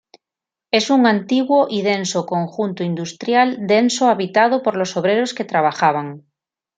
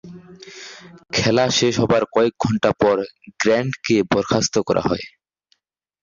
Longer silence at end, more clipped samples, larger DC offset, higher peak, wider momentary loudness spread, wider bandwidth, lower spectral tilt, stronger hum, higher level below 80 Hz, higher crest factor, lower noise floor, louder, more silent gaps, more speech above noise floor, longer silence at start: second, 0.6 s vs 0.95 s; neither; neither; about the same, -2 dBFS vs -4 dBFS; second, 8 LU vs 20 LU; first, 9.4 kHz vs 7.6 kHz; about the same, -4.5 dB/octave vs -4.5 dB/octave; neither; second, -68 dBFS vs -50 dBFS; about the same, 16 dB vs 16 dB; first, -87 dBFS vs -66 dBFS; about the same, -17 LUFS vs -19 LUFS; neither; first, 70 dB vs 47 dB; first, 0.75 s vs 0.05 s